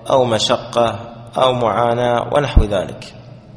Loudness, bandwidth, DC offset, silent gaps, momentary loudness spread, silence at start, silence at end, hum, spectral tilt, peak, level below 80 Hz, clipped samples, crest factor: -17 LUFS; 11 kHz; under 0.1%; none; 13 LU; 0 s; 0 s; none; -5 dB/octave; 0 dBFS; -26 dBFS; under 0.1%; 16 dB